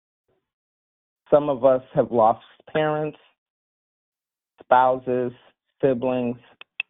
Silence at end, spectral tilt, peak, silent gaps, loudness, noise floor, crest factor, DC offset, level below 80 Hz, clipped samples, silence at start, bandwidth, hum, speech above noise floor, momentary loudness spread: 0.1 s; -5 dB/octave; -2 dBFS; 3.38-4.12 s; -22 LUFS; -55 dBFS; 22 dB; under 0.1%; -62 dBFS; under 0.1%; 1.3 s; 3.9 kHz; none; 34 dB; 13 LU